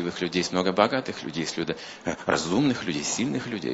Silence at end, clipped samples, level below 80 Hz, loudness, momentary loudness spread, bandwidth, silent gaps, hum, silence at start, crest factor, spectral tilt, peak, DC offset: 0 s; under 0.1%; -60 dBFS; -26 LUFS; 9 LU; 8 kHz; none; none; 0 s; 24 dB; -4 dB/octave; -2 dBFS; under 0.1%